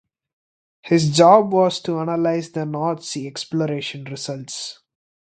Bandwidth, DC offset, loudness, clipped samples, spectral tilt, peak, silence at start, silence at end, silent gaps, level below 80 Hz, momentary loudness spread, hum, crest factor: 9.4 kHz; under 0.1%; -20 LUFS; under 0.1%; -5.5 dB/octave; 0 dBFS; 0.85 s; 0.6 s; none; -64 dBFS; 17 LU; none; 20 dB